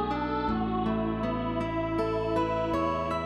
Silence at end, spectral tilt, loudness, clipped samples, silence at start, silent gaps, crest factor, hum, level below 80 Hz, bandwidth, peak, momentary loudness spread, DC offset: 0 s; -7.5 dB/octave; -29 LUFS; under 0.1%; 0 s; none; 12 dB; none; -44 dBFS; 12 kHz; -16 dBFS; 2 LU; under 0.1%